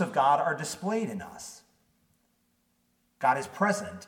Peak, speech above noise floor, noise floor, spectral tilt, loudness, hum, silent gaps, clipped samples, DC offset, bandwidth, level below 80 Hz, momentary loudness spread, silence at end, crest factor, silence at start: -12 dBFS; 44 dB; -72 dBFS; -4.5 dB/octave; -28 LUFS; none; none; under 0.1%; under 0.1%; 17.5 kHz; -70 dBFS; 17 LU; 0.05 s; 20 dB; 0 s